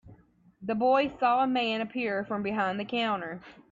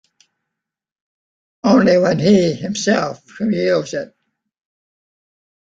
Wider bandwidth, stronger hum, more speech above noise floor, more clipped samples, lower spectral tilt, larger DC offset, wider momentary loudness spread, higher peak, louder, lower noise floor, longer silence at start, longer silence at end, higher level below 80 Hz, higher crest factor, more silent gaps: about the same, 7.6 kHz vs 7.8 kHz; neither; second, 30 dB vs 66 dB; neither; about the same, -6.5 dB/octave vs -5.5 dB/octave; neither; second, 9 LU vs 14 LU; second, -12 dBFS vs -2 dBFS; second, -28 LUFS vs -16 LUFS; second, -59 dBFS vs -81 dBFS; second, 0.05 s vs 1.65 s; second, 0.2 s vs 1.7 s; second, -66 dBFS vs -56 dBFS; about the same, 18 dB vs 18 dB; neither